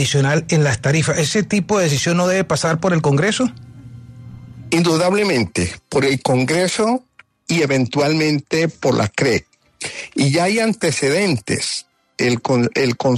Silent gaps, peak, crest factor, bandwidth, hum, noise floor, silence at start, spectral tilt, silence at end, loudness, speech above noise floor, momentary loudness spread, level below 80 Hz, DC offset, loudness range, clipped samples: none; -4 dBFS; 14 dB; 13.5 kHz; none; -37 dBFS; 0 s; -5 dB/octave; 0 s; -17 LUFS; 21 dB; 7 LU; -52 dBFS; under 0.1%; 2 LU; under 0.1%